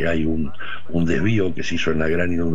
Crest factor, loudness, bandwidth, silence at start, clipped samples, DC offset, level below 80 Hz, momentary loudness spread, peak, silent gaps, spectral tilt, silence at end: 14 dB; -22 LUFS; 7.8 kHz; 0 s; under 0.1%; 9%; -38 dBFS; 7 LU; -6 dBFS; none; -6.5 dB/octave; 0 s